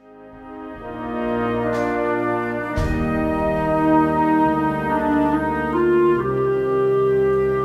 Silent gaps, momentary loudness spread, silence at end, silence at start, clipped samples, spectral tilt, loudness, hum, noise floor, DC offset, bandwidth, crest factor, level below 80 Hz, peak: none; 9 LU; 0 s; 0.1 s; under 0.1%; -8 dB/octave; -20 LUFS; none; -41 dBFS; under 0.1%; 12.5 kHz; 12 dB; -36 dBFS; -6 dBFS